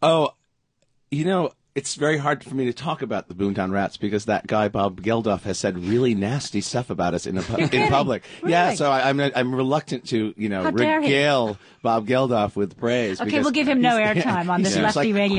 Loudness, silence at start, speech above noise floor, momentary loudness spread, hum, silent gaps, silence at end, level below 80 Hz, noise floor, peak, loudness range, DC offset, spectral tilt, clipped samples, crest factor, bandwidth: -22 LUFS; 0 s; 47 dB; 8 LU; none; none; 0 s; -52 dBFS; -69 dBFS; -6 dBFS; 4 LU; under 0.1%; -5.5 dB/octave; under 0.1%; 16 dB; 10.5 kHz